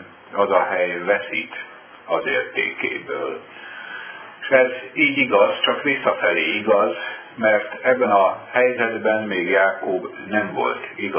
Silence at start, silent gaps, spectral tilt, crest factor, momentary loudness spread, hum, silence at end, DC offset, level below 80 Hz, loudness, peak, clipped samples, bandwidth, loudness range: 0 s; none; -7.5 dB/octave; 18 dB; 15 LU; none; 0 s; under 0.1%; -68 dBFS; -20 LUFS; -2 dBFS; under 0.1%; 3.5 kHz; 5 LU